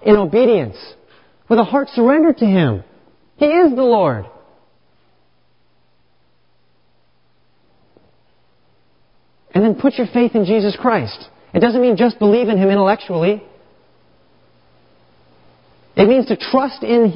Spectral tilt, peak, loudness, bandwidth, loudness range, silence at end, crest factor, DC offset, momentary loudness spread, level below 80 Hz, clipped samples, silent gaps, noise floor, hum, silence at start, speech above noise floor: -12 dB/octave; 0 dBFS; -15 LUFS; 5.6 kHz; 7 LU; 0 s; 16 dB; 0.2%; 9 LU; -52 dBFS; under 0.1%; none; -62 dBFS; 60 Hz at -45 dBFS; 0.05 s; 48 dB